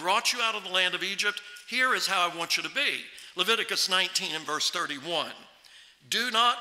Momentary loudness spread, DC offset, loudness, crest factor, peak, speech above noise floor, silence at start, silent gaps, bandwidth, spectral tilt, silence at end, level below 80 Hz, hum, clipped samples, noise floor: 8 LU; under 0.1%; -26 LUFS; 20 dB; -10 dBFS; 26 dB; 0 s; none; 16 kHz; -0.5 dB/octave; 0 s; -80 dBFS; none; under 0.1%; -54 dBFS